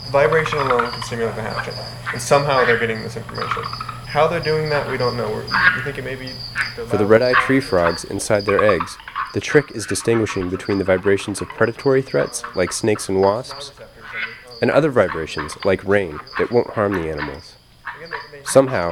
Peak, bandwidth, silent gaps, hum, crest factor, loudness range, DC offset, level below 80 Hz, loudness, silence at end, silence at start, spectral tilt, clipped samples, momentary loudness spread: 0 dBFS; 17.5 kHz; none; none; 20 dB; 3 LU; under 0.1%; -46 dBFS; -19 LUFS; 0 s; 0 s; -4.5 dB/octave; under 0.1%; 13 LU